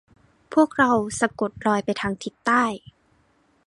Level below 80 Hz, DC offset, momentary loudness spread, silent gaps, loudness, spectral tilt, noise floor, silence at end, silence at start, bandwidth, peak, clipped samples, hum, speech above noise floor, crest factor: -58 dBFS; under 0.1%; 9 LU; none; -22 LUFS; -4.5 dB/octave; -63 dBFS; 0.9 s; 0.5 s; 11.5 kHz; -4 dBFS; under 0.1%; none; 41 dB; 20 dB